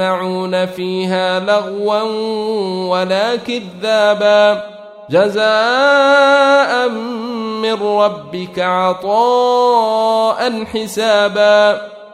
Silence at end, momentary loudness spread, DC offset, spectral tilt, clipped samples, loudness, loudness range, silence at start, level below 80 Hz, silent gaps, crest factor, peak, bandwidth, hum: 0.05 s; 10 LU; under 0.1%; -4.5 dB/octave; under 0.1%; -14 LUFS; 5 LU; 0 s; -60 dBFS; none; 12 dB; 0 dBFS; 14.5 kHz; none